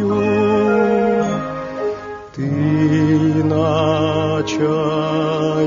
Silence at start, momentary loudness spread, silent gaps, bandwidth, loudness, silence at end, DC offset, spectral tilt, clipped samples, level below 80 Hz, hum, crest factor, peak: 0 s; 9 LU; none; 7.4 kHz; -17 LUFS; 0 s; under 0.1%; -6.5 dB/octave; under 0.1%; -48 dBFS; none; 14 dB; -4 dBFS